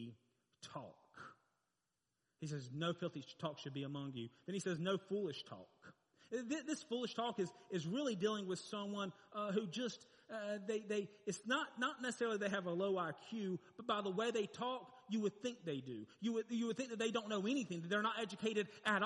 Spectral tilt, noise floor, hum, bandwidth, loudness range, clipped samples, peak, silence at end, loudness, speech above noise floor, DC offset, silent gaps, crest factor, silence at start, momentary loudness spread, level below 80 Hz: -5 dB/octave; -89 dBFS; none; 11 kHz; 6 LU; under 0.1%; -24 dBFS; 0 s; -43 LUFS; 47 dB; under 0.1%; none; 20 dB; 0 s; 12 LU; -88 dBFS